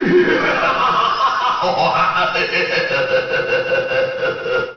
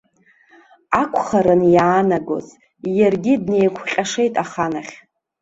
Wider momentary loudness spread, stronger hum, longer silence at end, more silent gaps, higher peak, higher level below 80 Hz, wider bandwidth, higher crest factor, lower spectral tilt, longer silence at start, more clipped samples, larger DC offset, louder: second, 4 LU vs 13 LU; neither; second, 0 s vs 0.45 s; neither; about the same, -4 dBFS vs -2 dBFS; about the same, -50 dBFS vs -54 dBFS; second, 6.8 kHz vs 8 kHz; about the same, 12 dB vs 16 dB; second, -2 dB/octave vs -6 dB/octave; second, 0 s vs 0.9 s; neither; neither; about the same, -16 LUFS vs -18 LUFS